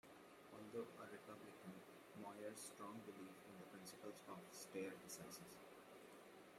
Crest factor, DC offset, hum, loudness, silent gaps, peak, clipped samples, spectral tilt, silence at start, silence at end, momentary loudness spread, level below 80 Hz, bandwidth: 18 dB; under 0.1%; none; -57 LUFS; none; -38 dBFS; under 0.1%; -4 dB/octave; 0.05 s; 0 s; 10 LU; under -90 dBFS; 16 kHz